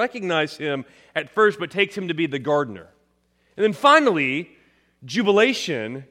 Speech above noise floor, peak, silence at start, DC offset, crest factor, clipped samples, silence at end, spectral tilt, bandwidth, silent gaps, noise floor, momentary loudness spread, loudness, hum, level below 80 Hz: 44 dB; -2 dBFS; 0 s; under 0.1%; 20 dB; under 0.1%; 0.05 s; -4.5 dB/octave; 13 kHz; none; -65 dBFS; 14 LU; -21 LUFS; none; -70 dBFS